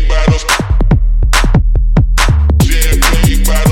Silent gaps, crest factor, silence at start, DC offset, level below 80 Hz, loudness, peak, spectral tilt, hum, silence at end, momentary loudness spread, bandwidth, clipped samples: none; 8 dB; 0 s; under 0.1%; -10 dBFS; -11 LUFS; 0 dBFS; -4.5 dB/octave; none; 0 s; 2 LU; 17 kHz; under 0.1%